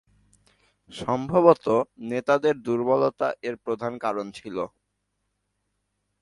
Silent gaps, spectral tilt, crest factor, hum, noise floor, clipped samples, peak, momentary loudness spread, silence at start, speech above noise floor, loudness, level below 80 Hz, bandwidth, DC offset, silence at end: none; -7 dB/octave; 24 dB; none; -77 dBFS; under 0.1%; -2 dBFS; 15 LU; 0.9 s; 53 dB; -24 LUFS; -64 dBFS; 11.5 kHz; under 0.1%; 1.55 s